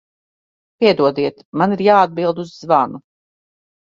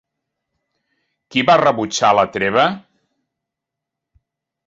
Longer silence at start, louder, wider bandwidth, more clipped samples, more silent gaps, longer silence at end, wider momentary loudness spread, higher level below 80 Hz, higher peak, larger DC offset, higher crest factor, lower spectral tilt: second, 0.8 s vs 1.3 s; about the same, -16 LUFS vs -15 LUFS; about the same, 7.4 kHz vs 7.8 kHz; neither; first, 1.45-1.53 s vs none; second, 0.95 s vs 1.9 s; about the same, 9 LU vs 7 LU; about the same, -62 dBFS vs -58 dBFS; about the same, 0 dBFS vs -2 dBFS; neither; about the same, 18 dB vs 18 dB; first, -7 dB/octave vs -4 dB/octave